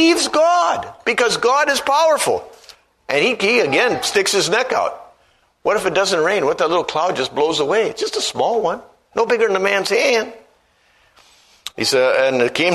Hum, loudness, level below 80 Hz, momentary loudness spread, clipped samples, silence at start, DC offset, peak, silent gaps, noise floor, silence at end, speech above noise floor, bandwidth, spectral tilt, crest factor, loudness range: none; -17 LUFS; -58 dBFS; 7 LU; under 0.1%; 0 s; under 0.1%; 0 dBFS; none; -58 dBFS; 0 s; 41 dB; 13.5 kHz; -2.5 dB/octave; 18 dB; 2 LU